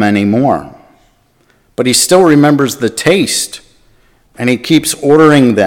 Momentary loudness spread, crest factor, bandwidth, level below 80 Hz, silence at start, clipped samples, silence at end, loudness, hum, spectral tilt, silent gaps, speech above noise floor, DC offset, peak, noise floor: 11 LU; 10 dB; 18 kHz; -48 dBFS; 0 s; 0.8%; 0 s; -10 LUFS; none; -4.5 dB/octave; none; 43 dB; under 0.1%; 0 dBFS; -52 dBFS